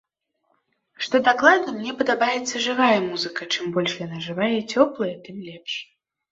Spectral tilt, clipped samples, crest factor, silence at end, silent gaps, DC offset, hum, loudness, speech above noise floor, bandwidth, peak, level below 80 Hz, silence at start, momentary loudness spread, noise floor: -3.5 dB/octave; under 0.1%; 22 dB; 0.5 s; none; under 0.1%; none; -22 LUFS; 50 dB; 8 kHz; -2 dBFS; -68 dBFS; 1 s; 14 LU; -72 dBFS